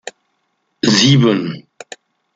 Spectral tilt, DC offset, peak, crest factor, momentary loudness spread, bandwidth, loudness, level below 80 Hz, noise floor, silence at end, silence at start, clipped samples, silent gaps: -4.5 dB/octave; under 0.1%; 0 dBFS; 16 dB; 25 LU; 9.2 kHz; -13 LUFS; -54 dBFS; -67 dBFS; 0.75 s; 0.05 s; under 0.1%; none